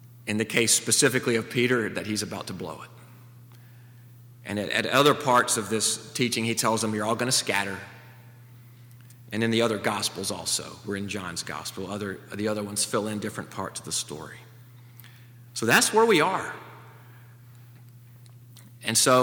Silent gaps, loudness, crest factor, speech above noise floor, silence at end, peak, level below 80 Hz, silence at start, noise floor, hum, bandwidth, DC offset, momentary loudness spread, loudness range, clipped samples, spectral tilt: none; -25 LUFS; 24 dB; 23 dB; 0 s; -4 dBFS; -68 dBFS; 0 s; -49 dBFS; none; over 20 kHz; under 0.1%; 17 LU; 7 LU; under 0.1%; -3 dB/octave